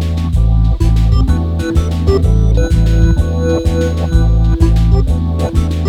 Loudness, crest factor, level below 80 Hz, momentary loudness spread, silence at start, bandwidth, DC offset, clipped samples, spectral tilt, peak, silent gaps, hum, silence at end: -13 LUFS; 10 dB; -14 dBFS; 3 LU; 0 s; 9.8 kHz; under 0.1%; under 0.1%; -8 dB/octave; 0 dBFS; none; none; 0 s